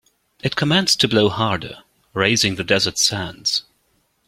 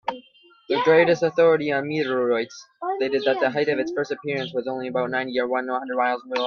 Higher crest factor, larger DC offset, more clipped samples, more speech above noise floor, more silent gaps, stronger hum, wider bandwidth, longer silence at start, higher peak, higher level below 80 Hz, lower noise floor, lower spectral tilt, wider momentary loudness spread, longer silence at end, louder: about the same, 20 dB vs 18 dB; neither; neither; first, 46 dB vs 31 dB; neither; neither; first, 16.5 kHz vs 6.8 kHz; first, 0.45 s vs 0.05 s; about the same, -2 dBFS vs -4 dBFS; first, -52 dBFS vs -68 dBFS; first, -65 dBFS vs -53 dBFS; second, -3 dB/octave vs -5.5 dB/octave; about the same, 11 LU vs 10 LU; first, 0.65 s vs 0 s; first, -18 LUFS vs -23 LUFS